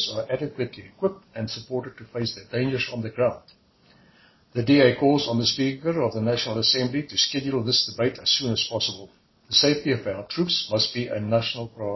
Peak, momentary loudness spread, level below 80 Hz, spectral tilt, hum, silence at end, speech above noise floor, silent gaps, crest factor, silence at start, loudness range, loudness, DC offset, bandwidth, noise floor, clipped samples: -4 dBFS; 12 LU; -58 dBFS; -4.5 dB/octave; none; 0 s; 33 dB; none; 20 dB; 0 s; 7 LU; -24 LUFS; under 0.1%; 6.2 kHz; -57 dBFS; under 0.1%